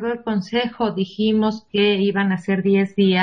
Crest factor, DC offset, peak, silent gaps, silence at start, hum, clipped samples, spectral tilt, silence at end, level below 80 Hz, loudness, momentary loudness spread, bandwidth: 16 dB; under 0.1%; -4 dBFS; none; 0 s; none; under 0.1%; -7.5 dB/octave; 0 s; -58 dBFS; -20 LUFS; 6 LU; 6.6 kHz